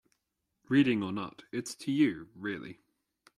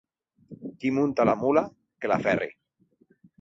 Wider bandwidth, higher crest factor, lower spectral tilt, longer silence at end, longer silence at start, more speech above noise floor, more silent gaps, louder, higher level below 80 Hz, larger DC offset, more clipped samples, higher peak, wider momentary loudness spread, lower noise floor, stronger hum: first, 13 kHz vs 7.6 kHz; about the same, 20 dB vs 20 dB; second, -5.5 dB/octave vs -7.5 dB/octave; second, 0.65 s vs 0.9 s; first, 0.7 s vs 0.5 s; first, 52 dB vs 42 dB; neither; second, -31 LUFS vs -26 LUFS; second, -72 dBFS vs -64 dBFS; neither; neither; second, -14 dBFS vs -8 dBFS; about the same, 13 LU vs 15 LU; first, -83 dBFS vs -66 dBFS; neither